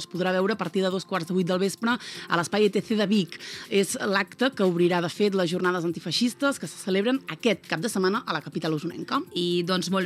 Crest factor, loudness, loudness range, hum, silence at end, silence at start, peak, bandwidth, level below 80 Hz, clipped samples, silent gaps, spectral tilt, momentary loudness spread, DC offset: 20 dB; -26 LUFS; 2 LU; none; 0 s; 0 s; -6 dBFS; 15 kHz; -74 dBFS; under 0.1%; none; -5 dB/octave; 6 LU; under 0.1%